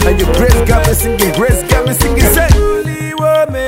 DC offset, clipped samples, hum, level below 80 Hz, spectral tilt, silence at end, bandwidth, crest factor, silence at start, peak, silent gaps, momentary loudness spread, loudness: under 0.1%; 1%; none; -14 dBFS; -5 dB/octave; 0 s; 16.5 kHz; 10 dB; 0 s; 0 dBFS; none; 5 LU; -11 LUFS